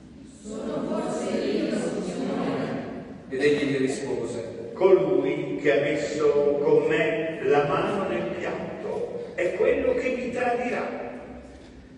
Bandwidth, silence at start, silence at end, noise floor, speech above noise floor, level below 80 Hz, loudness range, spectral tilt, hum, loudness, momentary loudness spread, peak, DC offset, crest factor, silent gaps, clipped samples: 11 kHz; 0 s; 0 s; -45 dBFS; 22 dB; -56 dBFS; 5 LU; -6 dB/octave; none; -25 LUFS; 14 LU; -6 dBFS; under 0.1%; 20 dB; none; under 0.1%